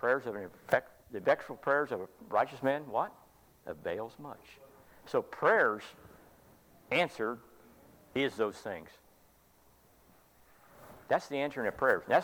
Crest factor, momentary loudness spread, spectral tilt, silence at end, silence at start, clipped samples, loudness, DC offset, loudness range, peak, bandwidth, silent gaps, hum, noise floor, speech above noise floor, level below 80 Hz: 22 dB; 18 LU; -5 dB/octave; 0 s; 0 s; under 0.1%; -33 LUFS; under 0.1%; 7 LU; -12 dBFS; 19 kHz; none; none; -65 dBFS; 32 dB; -70 dBFS